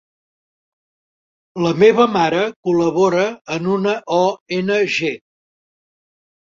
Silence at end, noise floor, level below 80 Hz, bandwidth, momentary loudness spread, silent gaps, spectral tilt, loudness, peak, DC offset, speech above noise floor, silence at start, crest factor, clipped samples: 1.35 s; under -90 dBFS; -60 dBFS; 7.6 kHz; 10 LU; 2.56-2.63 s, 3.41-3.45 s, 4.40-4.46 s; -5.5 dB/octave; -17 LUFS; -2 dBFS; under 0.1%; over 74 dB; 1.55 s; 18 dB; under 0.1%